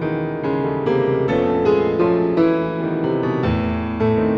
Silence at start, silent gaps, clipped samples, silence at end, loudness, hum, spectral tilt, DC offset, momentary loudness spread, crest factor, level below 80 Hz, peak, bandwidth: 0 s; none; under 0.1%; 0 s; -19 LUFS; none; -9.5 dB/octave; under 0.1%; 5 LU; 14 dB; -40 dBFS; -4 dBFS; 6.4 kHz